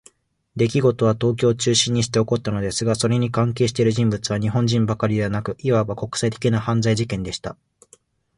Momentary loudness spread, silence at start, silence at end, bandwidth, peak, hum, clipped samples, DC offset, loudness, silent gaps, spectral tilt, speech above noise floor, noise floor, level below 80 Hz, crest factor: 7 LU; 0.55 s; 0.85 s; 11.5 kHz; -4 dBFS; none; under 0.1%; under 0.1%; -21 LUFS; none; -5.5 dB/octave; 36 dB; -56 dBFS; -48 dBFS; 18 dB